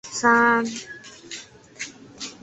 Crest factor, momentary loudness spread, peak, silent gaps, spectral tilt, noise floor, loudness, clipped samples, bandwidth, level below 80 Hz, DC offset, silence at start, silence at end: 20 dB; 21 LU; -4 dBFS; none; -2.5 dB/octave; -41 dBFS; -19 LUFS; under 0.1%; 8.4 kHz; -66 dBFS; under 0.1%; 0.05 s; 0.1 s